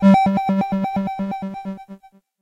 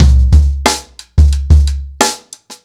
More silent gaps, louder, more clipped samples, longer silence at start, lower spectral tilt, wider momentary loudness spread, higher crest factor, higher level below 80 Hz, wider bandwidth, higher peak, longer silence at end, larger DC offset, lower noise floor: neither; second, -20 LUFS vs -12 LUFS; neither; about the same, 0 s vs 0 s; first, -8.5 dB/octave vs -4.5 dB/octave; first, 17 LU vs 9 LU; first, 16 dB vs 10 dB; second, -52 dBFS vs -12 dBFS; second, 7.4 kHz vs 14.5 kHz; second, -4 dBFS vs 0 dBFS; first, 0.45 s vs 0.1 s; neither; first, -44 dBFS vs -35 dBFS